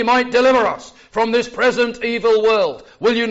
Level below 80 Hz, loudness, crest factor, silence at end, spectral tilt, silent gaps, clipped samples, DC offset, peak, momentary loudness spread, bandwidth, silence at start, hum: -52 dBFS; -17 LUFS; 12 dB; 0 s; -1.5 dB/octave; none; under 0.1%; under 0.1%; -4 dBFS; 8 LU; 8 kHz; 0 s; none